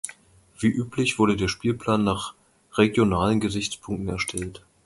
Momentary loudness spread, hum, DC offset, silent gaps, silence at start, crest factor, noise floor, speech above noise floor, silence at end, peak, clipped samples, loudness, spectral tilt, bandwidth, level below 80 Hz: 10 LU; none; under 0.1%; none; 0.05 s; 20 dB; -53 dBFS; 30 dB; 0.3 s; -4 dBFS; under 0.1%; -24 LUFS; -5 dB/octave; 11.5 kHz; -46 dBFS